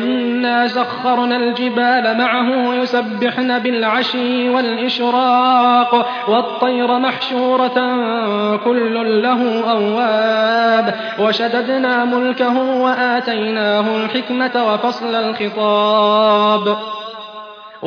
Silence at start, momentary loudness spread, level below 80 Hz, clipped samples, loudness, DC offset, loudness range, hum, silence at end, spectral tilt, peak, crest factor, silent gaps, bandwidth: 0 s; 6 LU; -70 dBFS; under 0.1%; -15 LUFS; under 0.1%; 2 LU; none; 0 s; -6 dB/octave; 0 dBFS; 14 dB; none; 5.4 kHz